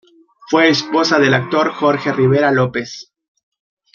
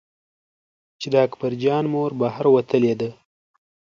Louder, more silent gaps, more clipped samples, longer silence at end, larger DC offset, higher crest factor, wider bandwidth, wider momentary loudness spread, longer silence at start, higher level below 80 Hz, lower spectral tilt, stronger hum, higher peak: first, -15 LUFS vs -21 LUFS; neither; neither; first, 0.95 s vs 0.8 s; neither; about the same, 16 dB vs 18 dB; about the same, 7.2 kHz vs 7.4 kHz; about the same, 8 LU vs 9 LU; second, 0.5 s vs 1 s; first, -60 dBFS vs -66 dBFS; second, -5.5 dB/octave vs -7.5 dB/octave; neither; first, -2 dBFS vs -6 dBFS